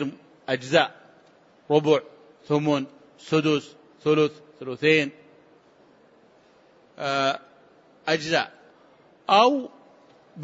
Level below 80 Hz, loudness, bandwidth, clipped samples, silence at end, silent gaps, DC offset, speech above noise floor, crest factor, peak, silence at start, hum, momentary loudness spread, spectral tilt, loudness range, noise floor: -74 dBFS; -24 LUFS; 8 kHz; under 0.1%; 0 s; none; under 0.1%; 34 dB; 22 dB; -4 dBFS; 0 s; none; 14 LU; -5 dB/octave; 4 LU; -57 dBFS